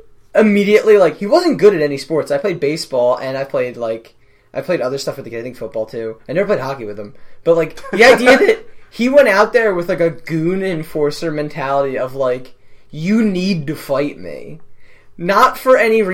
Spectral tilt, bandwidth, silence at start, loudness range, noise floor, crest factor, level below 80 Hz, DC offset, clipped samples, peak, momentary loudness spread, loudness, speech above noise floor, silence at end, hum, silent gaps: -5.5 dB/octave; 16.5 kHz; 0.35 s; 9 LU; -35 dBFS; 16 dB; -48 dBFS; under 0.1%; under 0.1%; 0 dBFS; 16 LU; -15 LUFS; 21 dB; 0 s; none; none